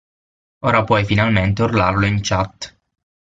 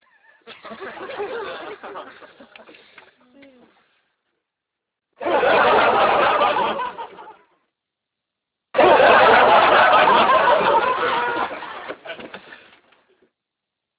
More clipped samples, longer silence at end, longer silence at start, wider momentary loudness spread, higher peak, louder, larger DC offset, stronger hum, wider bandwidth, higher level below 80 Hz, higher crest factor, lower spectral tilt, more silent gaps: neither; second, 0.65 s vs 1.45 s; first, 0.65 s vs 0.5 s; second, 10 LU vs 23 LU; about the same, -2 dBFS vs -2 dBFS; about the same, -17 LUFS vs -16 LUFS; neither; neither; first, 7.8 kHz vs 4 kHz; first, -36 dBFS vs -56 dBFS; about the same, 16 dB vs 18 dB; about the same, -6 dB/octave vs -7 dB/octave; neither